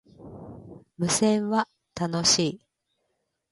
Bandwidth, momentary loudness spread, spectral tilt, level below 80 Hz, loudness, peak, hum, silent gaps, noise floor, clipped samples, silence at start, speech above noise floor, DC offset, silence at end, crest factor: 11.5 kHz; 23 LU; -3.5 dB/octave; -60 dBFS; -24 LUFS; -8 dBFS; none; none; -77 dBFS; under 0.1%; 0.2 s; 53 dB; under 0.1%; 0.95 s; 20 dB